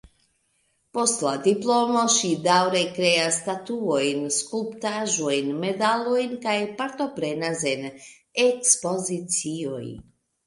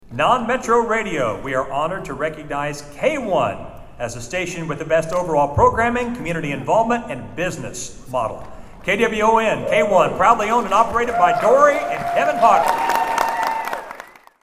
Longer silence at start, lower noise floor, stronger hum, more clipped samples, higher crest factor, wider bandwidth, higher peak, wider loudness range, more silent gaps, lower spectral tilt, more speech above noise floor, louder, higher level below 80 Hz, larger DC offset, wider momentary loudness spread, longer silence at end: first, 0.95 s vs 0.05 s; first, -69 dBFS vs -41 dBFS; neither; neither; about the same, 22 dB vs 18 dB; second, 11.5 kHz vs 16 kHz; second, -4 dBFS vs 0 dBFS; second, 4 LU vs 7 LU; neither; second, -2.5 dB/octave vs -4.5 dB/octave; first, 45 dB vs 22 dB; second, -23 LUFS vs -19 LUFS; second, -66 dBFS vs -42 dBFS; neither; second, 10 LU vs 13 LU; about the same, 0.45 s vs 0.35 s